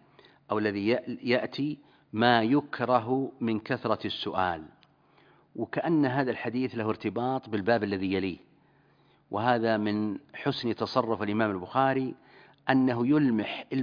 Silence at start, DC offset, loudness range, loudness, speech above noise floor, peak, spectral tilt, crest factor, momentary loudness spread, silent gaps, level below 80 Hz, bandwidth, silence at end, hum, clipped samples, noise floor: 0.5 s; under 0.1%; 3 LU; -28 LUFS; 36 dB; -6 dBFS; -8 dB/octave; 22 dB; 10 LU; none; -68 dBFS; 5.2 kHz; 0 s; none; under 0.1%; -64 dBFS